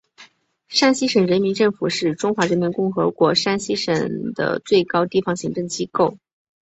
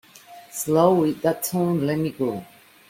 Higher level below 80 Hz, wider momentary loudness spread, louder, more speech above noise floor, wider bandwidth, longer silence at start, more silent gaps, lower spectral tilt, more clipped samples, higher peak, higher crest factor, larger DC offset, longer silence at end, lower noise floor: about the same, -60 dBFS vs -60 dBFS; second, 7 LU vs 12 LU; about the same, -20 LUFS vs -22 LUFS; first, 32 dB vs 25 dB; second, 8.2 kHz vs 16.5 kHz; about the same, 0.2 s vs 0.3 s; neither; second, -4.5 dB/octave vs -6 dB/octave; neither; about the same, -2 dBFS vs -4 dBFS; about the same, 18 dB vs 18 dB; neither; first, 0.6 s vs 0.45 s; first, -51 dBFS vs -46 dBFS